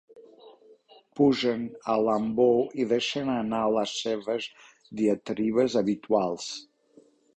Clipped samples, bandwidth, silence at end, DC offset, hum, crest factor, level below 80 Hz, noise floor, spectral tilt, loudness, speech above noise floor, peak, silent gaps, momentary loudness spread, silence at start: under 0.1%; 8.8 kHz; 0.75 s; under 0.1%; none; 18 dB; -66 dBFS; -59 dBFS; -5 dB/octave; -26 LUFS; 33 dB; -10 dBFS; none; 11 LU; 0.15 s